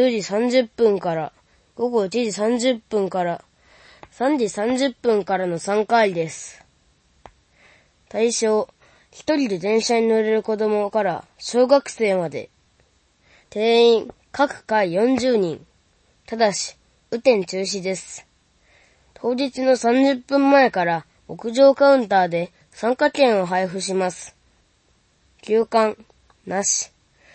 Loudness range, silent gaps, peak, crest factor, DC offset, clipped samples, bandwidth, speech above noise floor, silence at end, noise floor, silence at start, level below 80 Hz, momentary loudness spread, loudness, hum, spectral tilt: 6 LU; none; -2 dBFS; 18 dB; under 0.1%; under 0.1%; 8.8 kHz; 42 dB; 0.5 s; -62 dBFS; 0 s; -62 dBFS; 15 LU; -20 LUFS; none; -4 dB/octave